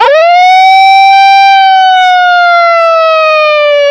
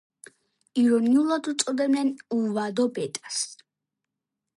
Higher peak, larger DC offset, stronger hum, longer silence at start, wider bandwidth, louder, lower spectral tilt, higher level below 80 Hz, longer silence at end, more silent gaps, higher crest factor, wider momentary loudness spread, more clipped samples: first, 0 dBFS vs -8 dBFS; neither; neither; second, 0 s vs 0.75 s; second, 9.8 kHz vs 11.5 kHz; first, -4 LUFS vs -25 LUFS; second, 2 dB/octave vs -4 dB/octave; first, -58 dBFS vs -78 dBFS; second, 0 s vs 1 s; neither; second, 4 dB vs 18 dB; second, 3 LU vs 9 LU; neither